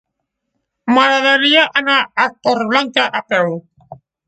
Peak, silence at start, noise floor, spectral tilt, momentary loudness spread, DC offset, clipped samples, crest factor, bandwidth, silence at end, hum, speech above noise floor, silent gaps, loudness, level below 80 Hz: 0 dBFS; 0.85 s; -75 dBFS; -3.5 dB/octave; 7 LU; under 0.1%; under 0.1%; 16 dB; 9.2 kHz; 0.35 s; none; 61 dB; none; -13 LUFS; -62 dBFS